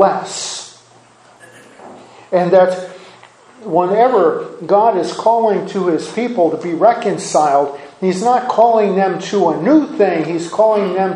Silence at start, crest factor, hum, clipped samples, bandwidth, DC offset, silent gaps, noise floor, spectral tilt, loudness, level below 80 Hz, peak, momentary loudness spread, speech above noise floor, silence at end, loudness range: 0 s; 14 dB; none; under 0.1%; 11 kHz; under 0.1%; none; -46 dBFS; -5.5 dB/octave; -15 LUFS; -66 dBFS; 0 dBFS; 10 LU; 32 dB; 0 s; 5 LU